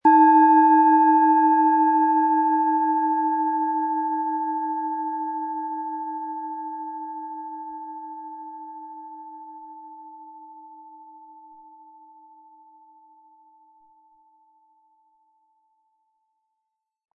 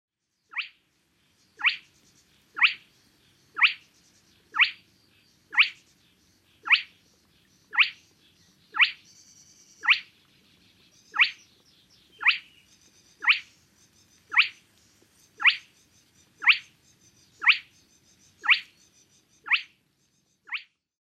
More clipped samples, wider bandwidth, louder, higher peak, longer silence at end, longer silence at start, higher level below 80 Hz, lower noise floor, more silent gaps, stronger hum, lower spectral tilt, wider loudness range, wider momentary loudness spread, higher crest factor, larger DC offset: neither; second, 3.8 kHz vs 14 kHz; first, -20 LUFS vs -24 LUFS; about the same, -6 dBFS vs -6 dBFS; first, 6.1 s vs 0.45 s; second, 0.05 s vs 0.55 s; about the same, -80 dBFS vs -80 dBFS; first, -82 dBFS vs -70 dBFS; neither; neither; first, -8.5 dB/octave vs 1.5 dB/octave; first, 25 LU vs 3 LU; first, 25 LU vs 15 LU; second, 18 dB vs 24 dB; neither